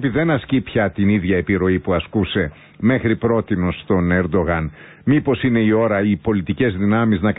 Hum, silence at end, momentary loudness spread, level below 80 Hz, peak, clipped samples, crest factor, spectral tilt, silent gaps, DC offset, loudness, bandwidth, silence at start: none; 0.05 s; 5 LU; -36 dBFS; -6 dBFS; under 0.1%; 12 dB; -12.5 dB/octave; none; under 0.1%; -18 LUFS; 4 kHz; 0 s